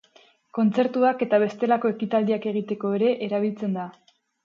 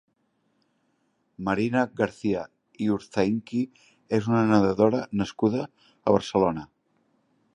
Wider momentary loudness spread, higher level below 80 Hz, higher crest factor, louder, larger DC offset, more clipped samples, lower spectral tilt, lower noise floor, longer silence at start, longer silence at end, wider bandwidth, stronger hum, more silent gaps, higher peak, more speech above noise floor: about the same, 8 LU vs 10 LU; second, -74 dBFS vs -58 dBFS; second, 16 dB vs 22 dB; about the same, -24 LUFS vs -25 LUFS; neither; neither; about the same, -8 dB/octave vs -7 dB/octave; second, -58 dBFS vs -71 dBFS; second, 0.55 s vs 1.4 s; second, 0.55 s vs 0.9 s; second, 7 kHz vs 10.5 kHz; neither; neither; second, -8 dBFS vs -4 dBFS; second, 35 dB vs 47 dB